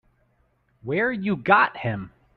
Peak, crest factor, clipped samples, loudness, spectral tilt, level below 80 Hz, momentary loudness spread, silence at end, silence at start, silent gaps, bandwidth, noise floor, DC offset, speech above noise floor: -4 dBFS; 22 dB; under 0.1%; -22 LUFS; -9 dB/octave; -60 dBFS; 14 LU; 0.3 s; 0.85 s; none; 5 kHz; -66 dBFS; under 0.1%; 44 dB